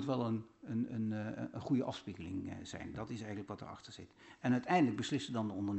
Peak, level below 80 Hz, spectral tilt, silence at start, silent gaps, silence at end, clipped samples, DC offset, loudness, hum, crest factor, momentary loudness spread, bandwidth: -20 dBFS; -70 dBFS; -6.5 dB/octave; 0 s; none; 0 s; under 0.1%; under 0.1%; -39 LUFS; none; 18 dB; 15 LU; 8.2 kHz